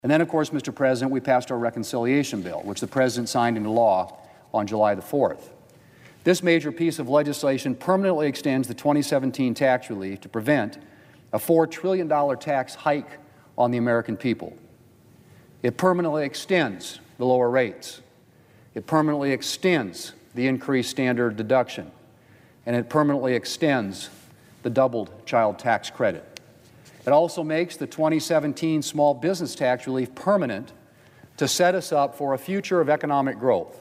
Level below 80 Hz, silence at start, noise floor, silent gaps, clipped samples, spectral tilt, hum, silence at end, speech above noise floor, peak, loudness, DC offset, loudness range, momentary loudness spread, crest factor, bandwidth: -68 dBFS; 0.05 s; -55 dBFS; none; under 0.1%; -5.5 dB/octave; none; 0 s; 32 dB; -6 dBFS; -24 LUFS; under 0.1%; 3 LU; 10 LU; 18 dB; 16 kHz